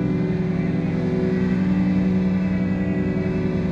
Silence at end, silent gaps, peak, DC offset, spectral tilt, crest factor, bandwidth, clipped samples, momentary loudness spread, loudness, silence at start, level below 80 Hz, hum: 0 s; none; -10 dBFS; under 0.1%; -9.5 dB/octave; 10 dB; 6.4 kHz; under 0.1%; 3 LU; -22 LUFS; 0 s; -40 dBFS; 50 Hz at -60 dBFS